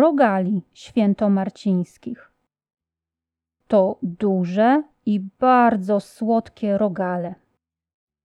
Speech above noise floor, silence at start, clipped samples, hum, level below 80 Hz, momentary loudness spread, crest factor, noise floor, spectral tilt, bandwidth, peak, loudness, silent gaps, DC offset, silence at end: 68 dB; 0 s; under 0.1%; none; -64 dBFS; 11 LU; 16 dB; -88 dBFS; -8.5 dB/octave; 11 kHz; -6 dBFS; -20 LUFS; none; under 0.1%; 0.9 s